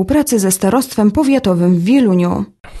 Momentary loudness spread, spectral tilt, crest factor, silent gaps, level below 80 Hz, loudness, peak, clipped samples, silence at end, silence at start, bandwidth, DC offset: 5 LU; -6 dB/octave; 12 dB; none; -38 dBFS; -13 LUFS; 0 dBFS; under 0.1%; 0 s; 0 s; 13 kHz; under 0.1%